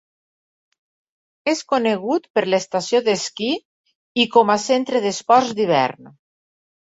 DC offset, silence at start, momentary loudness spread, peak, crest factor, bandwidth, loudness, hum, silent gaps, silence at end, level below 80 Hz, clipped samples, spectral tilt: under 0.1%; 1.45 s; 8 LU; -2 dBFS; 20 dB; 8 kHz; -19 LUFS; none; 2.30-2.34 s, 3.65-3.84 s, 3.95-4.15 s; 0.75 s; -66 dBFS; under 0.1%; -3.5 dB/octave